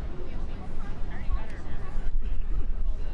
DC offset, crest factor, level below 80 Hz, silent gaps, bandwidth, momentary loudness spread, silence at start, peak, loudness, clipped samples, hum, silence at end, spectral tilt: under 0.1%; 10 dB; -28 dBFS; none; 3.4 kHz; 4 LU; 0 s; -12 dBFS; -37 LUFS; under 0.1%; none; 0 s; -7.5 dB/octave